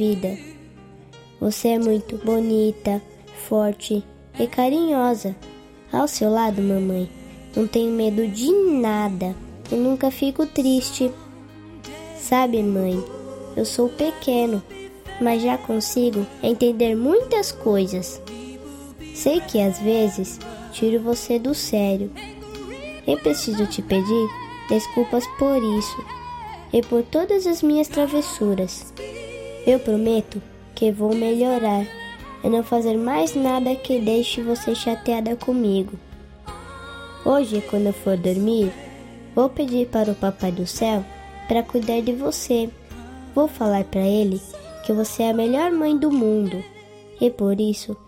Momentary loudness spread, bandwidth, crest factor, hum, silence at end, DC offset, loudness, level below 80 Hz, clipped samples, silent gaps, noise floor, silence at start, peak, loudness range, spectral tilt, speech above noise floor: 16 LU; 16.5 kHz; 18 dB; none; 0.1 s; under 0.1%; -22 LUFS; -48 dBFS; under 0.1%; none; -45 dBFS; 0 s; -4 dBFS; 2 LU; -5.5 dB/octave; 24 dB